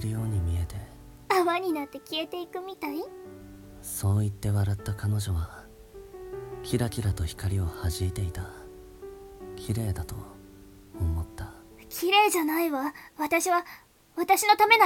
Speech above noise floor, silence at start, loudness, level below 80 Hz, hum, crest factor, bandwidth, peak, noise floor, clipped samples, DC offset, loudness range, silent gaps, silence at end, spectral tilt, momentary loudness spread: 23 dB; 0 s; -28 LUFS; -44 dBFS; none; 24 dB; 17.5 kHz; -6 dBFS; -50 dBFS; under 0.1%; under 0.1%; 8 LU; none; 0 s; -4.5 dB/octave; 22 LU